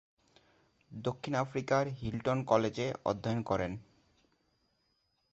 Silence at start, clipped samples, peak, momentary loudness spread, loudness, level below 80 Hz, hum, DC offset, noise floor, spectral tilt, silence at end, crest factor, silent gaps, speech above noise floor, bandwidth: 0.9 s; under 0.1%; -12 dBFS; 10 LU; -34 LUFS; -60 dBFS; none; under 0.1%; -77 dBFS; -5.5 dB/octave; 1.5 s; 24 dB; none; 44 dB; 8 kHz